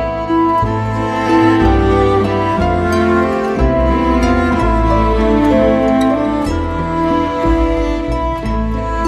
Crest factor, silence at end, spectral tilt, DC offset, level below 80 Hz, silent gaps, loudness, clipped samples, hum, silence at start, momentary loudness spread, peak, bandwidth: 14 dB; 0 s; -7.5 dB/octave; under 0.1%; -22 dBFS; none; -14 LUFS; under 0.1%; none; 0 s; 6 LU; 0 dBFS; 11.5 kHz